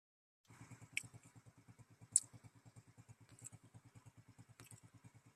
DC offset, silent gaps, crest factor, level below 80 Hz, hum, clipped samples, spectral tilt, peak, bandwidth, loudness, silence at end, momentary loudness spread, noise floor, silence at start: under 0.1%; none; 36 dB; -84 dBFS; none; under 0.1%; -1 dB/octave; -14 dBFS; 14 kHz; -40 LUFS; 0.05 s; 29 LU; -66 dBFS; 0.5 s